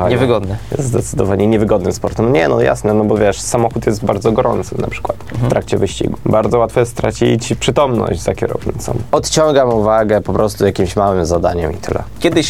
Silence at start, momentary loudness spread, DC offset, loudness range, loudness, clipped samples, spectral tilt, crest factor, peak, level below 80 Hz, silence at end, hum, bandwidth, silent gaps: 0 s; 8 LU; 1%; 2 LU; -15 LUFS; under 0.1%; -5.5 dB/octave; 14 dB; 0 dBFS; -34 dBFS; 0 s; none; 16 kHz; none